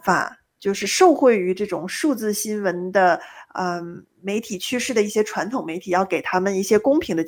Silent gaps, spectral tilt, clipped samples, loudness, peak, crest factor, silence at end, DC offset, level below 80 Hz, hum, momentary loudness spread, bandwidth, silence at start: none; -4 dB/octave; under 0.1%; -21 LUFS; -2 dBFS; 18 dB; 0 s; under 0.1%; -60 dBFS; none; 11 LU; over 20 kHz; 0.05 s